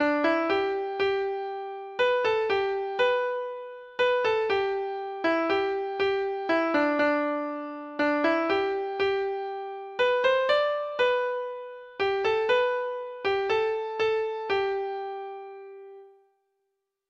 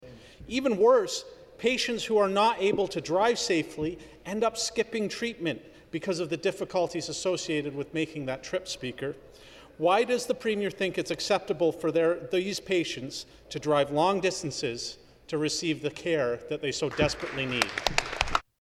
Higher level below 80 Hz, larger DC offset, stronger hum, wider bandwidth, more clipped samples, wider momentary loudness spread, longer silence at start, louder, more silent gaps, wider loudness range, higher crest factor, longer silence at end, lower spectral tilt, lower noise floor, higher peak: second, -66 dBFS vs -52 dBFS; neither; neither; second, 7.4 kHz vs 15 kHz; neither; about the same, 12 LU vs 11 LU; about the same, 0 s vs 0 s; about the same, -27 LUFS vs -28 LUFS; neither; about the same, 3 LU vs 5 LU; second, 16 dB vs 28 dB; first, 1 s vs 0.2 s; about the same, -4.5 dB/octave vs -4 dB/octave; first, -80 dBFS vs -47 dBFS; second, -12 dBFS vs -2 dBFS